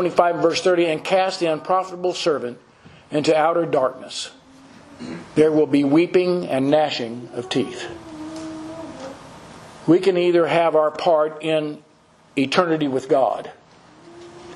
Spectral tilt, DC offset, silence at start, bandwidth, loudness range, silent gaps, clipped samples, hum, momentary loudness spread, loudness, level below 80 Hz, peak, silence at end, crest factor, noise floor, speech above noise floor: -5.5 dB/octave; under 0.1%; 0 s; 11.5 kHz; 4 LU; none; under 0.1%; none; 18 LU; -20 LUFS; -64 dBFS; 0 dBFS; 0 s; 20 dB; -53 dBFS; 34 dB